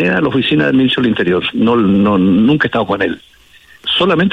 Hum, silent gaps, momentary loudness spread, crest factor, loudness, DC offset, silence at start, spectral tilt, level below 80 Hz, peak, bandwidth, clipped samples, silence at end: none; none; 6 LU; 10 dB; -13 LUFS; under 0.1%; 0 s; -7.5 dB/octave; -46 dBFS; -2 dBFS; 8.2 kHz; under 0.1%; 0 s